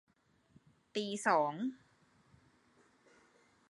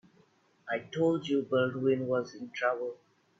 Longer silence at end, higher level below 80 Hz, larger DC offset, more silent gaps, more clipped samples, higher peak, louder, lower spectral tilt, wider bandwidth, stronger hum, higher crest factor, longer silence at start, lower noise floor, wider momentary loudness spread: first, 1.95 s vs 0.45 s; second, -84 dBFS vs -76 dBFS; neither; neither; neither; about the same, -16 dBFS vs -16 dBFS; second, -35 LUFS vs -31 LUFS; second, -4 dB/octave vs -6.5 dB/octave; first, 11 kHz vs 7.6 kHz; neither; first, 24 dB vs 16 dB; first, 0.95 s vs 0.65 s; first, -70 dBFS vs -66 dBFS; about the same, 11 LU vs 10 LU